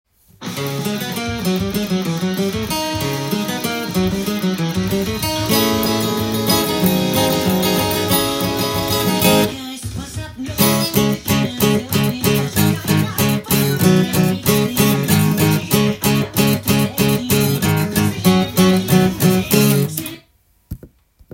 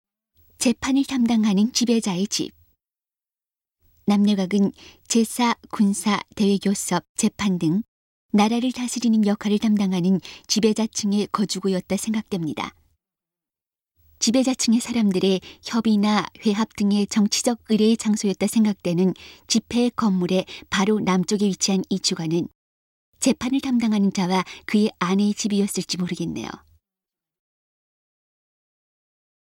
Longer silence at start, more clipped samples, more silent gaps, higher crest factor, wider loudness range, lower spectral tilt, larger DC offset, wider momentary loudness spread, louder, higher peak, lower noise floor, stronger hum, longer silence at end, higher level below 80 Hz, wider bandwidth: second, 0.4 s vs 0.6 s; neither; second, none vs 7.09-7.15 s, 7.88-8.29 s, 22.55-23.13 s; about the same, 18 dB vs 16 dB; about the same, 5 LU vs 4 LU; about the same, -5 dB/octave vs -4.5 dB/octave; neither; about the same, 8 LU vs 6 LU; first, -17 LUFS vs -22 LUFS; first, 0 dBFS vs -6 dBFS; second, -56 dBFS vs under -90 dBFS; neither; second, 0.5 s vs 2.85 s; first, -42 dBFS vs -58 dBFS; about the same, 17 kHz vs 16.5 kHz